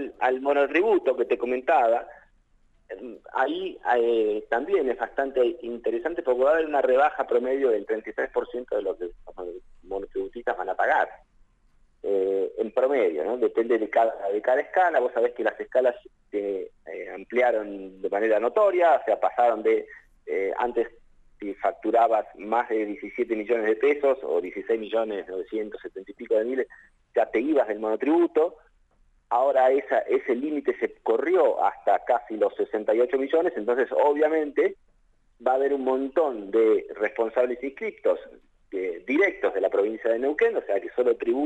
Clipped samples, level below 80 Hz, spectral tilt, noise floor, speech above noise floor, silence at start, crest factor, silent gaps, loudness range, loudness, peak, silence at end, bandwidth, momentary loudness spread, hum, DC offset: under 0.1%; -60 dBFS; -6 dB/octave; -62 dBFS; 38 dB; 0 s; 16 dB; none; 4 LU; -25 LUFS; -10 dBFS; 0 s; 8 kHz; 11 LU; none; under 0.1%